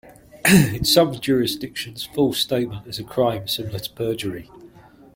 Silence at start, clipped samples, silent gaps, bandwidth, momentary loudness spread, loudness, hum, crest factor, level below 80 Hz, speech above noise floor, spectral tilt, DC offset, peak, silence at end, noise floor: 0.05 s; under 0.1%; none; 16.5 kHz; 14 LU; -21 LUFS; none; 20 dB; -48 dBFS; 26 dB; -4.5 dB/octave; under 0.1%; -2 dBFS; 0.5 s; -47 dBFS